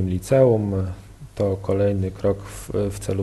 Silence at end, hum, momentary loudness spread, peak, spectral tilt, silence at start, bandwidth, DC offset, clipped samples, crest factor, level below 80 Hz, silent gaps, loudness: 0 s; none; 13 LU; -4 dBFS; -7.5 dB/octave; 0 s; 12.5 kHz; under 0.1%; under 0.1%; 16 dB; -42 dBFS; none; -22 LUFS